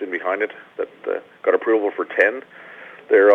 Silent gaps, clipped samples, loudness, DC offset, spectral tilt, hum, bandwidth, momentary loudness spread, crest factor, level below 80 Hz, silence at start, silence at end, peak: none; under 0.1%; -21 LUFS; under 0.1%; -5.5 dB/octave; none; 4 kHz; 21 LU; 18 dB; -82 dBFS; 0 s; 0 s; -2 dBFS